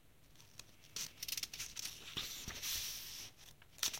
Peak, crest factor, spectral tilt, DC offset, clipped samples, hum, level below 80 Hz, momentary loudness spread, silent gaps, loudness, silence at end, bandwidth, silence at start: -18 dBFS; 30 dB; 0.5 dB/octave; under 0.1%; under 0.1%; none; -66 dBFS; 17 LU; none; -43 LUFS; 0 s; 17 kHz; 0 s